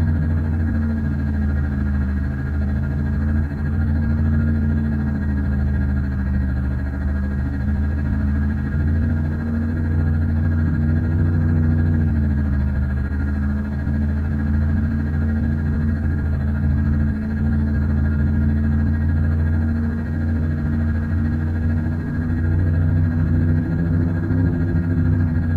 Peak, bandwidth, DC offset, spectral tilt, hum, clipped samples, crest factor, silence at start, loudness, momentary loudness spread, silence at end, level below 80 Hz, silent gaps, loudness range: -8 dBFS; 4.3 kHz; under 0.1%; -10.5 dB/octave; none; under 0.1%; 10 dB; 0 s; -21 LUFS; 4 LU; 0 s; -26 dBFS; none; 2 LU